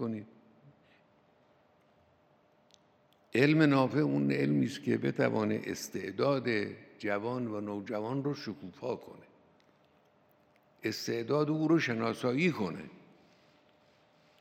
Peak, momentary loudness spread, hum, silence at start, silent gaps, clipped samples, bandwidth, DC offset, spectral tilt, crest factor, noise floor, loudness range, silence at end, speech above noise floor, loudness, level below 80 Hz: -12 dBFS; 13 LU; none; 0 s; none; under 0.1%; 16.5 kHz; under 0.1%; -6.5 dB/octave; 22 dB; -67 dBFS; 10 LU; 1.45 s; 36 dB; -32 LUFS; -80 dBFS